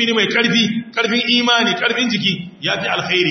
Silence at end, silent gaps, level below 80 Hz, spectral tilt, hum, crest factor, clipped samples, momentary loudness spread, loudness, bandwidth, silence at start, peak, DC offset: 0 s; none; -62 dBFS; -3.5 dB/octave; none; 16 dB; under 0.1%; 6 LU; -16 LUFS; 6.4 kHz; 0 s; -2 dBFS; under 0.1%